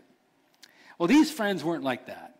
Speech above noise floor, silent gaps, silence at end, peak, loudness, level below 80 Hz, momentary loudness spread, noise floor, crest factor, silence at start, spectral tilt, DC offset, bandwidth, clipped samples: 41 dB; none; 0.1 s; -14 dBFS; -26 LUFS; -66 dBFS; 10 LU; -66 dBFS; 14 dB; 1 s; -5 dB/octave; under 0.1%; 16 kHz; under 0.1%